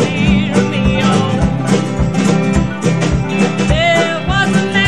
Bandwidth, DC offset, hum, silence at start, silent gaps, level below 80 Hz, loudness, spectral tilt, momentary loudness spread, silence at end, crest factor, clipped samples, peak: 10.5 kHz; 2%; none; 0 s; none; -26 dBFS; -13 LUFS; -5.5 dB/octave; 3 LU; 0 s; 12 dB; under 0.1%; 0 dBFS